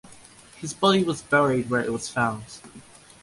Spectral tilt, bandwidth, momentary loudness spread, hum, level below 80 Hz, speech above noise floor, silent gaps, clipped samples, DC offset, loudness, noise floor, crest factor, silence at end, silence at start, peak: -4.5 dB/octave; 11.5 kHz; 16 LU; none; -58 dBFS; 25 dB; none; under 0.1%; under 0.1%; -23 LUFS; -49 dBFS; 20 dB; 0.4 s; 0.05 s; -6 dBFS